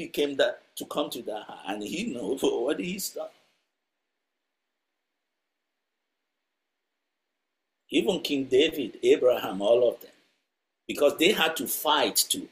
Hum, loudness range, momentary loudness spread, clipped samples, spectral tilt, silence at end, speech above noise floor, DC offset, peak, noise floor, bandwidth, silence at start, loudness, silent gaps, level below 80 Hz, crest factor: none; 10 LU; 14 LU; under 0.1%; -3 dB/octave; 0.05 s; 58 dB; under 0.1%; -8 dBFS; -84 dBFS; 16 kHz; 0 s; -26 LUFS; none; -68 dBFS; 22 dB